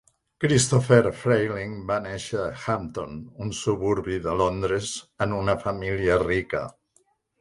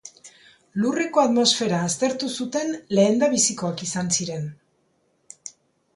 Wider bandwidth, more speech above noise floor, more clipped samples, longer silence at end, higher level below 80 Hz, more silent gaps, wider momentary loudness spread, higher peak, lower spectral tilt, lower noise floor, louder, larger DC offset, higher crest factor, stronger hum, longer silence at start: about the same, 11.5 kHz vs 11.5 kHz; about the same, 42 dB vs 45 dB; neither; first, 0.7 s vs 0.45 s; first, -46 dBFS vs -66 dBFS; neither; second, 13 LU vs 19 LU; about the same, -4 dBFS vs -6 dBFS; first, -5 dB/octave vs -3.5 dB/octave; about the same, -66 dBFS vs -67 dBFS; second, -25 LUFS vs -22 LUFS; neither; about the same, 22 dB vs 18 dB; neither; first, 0.4 s vs 0.05 s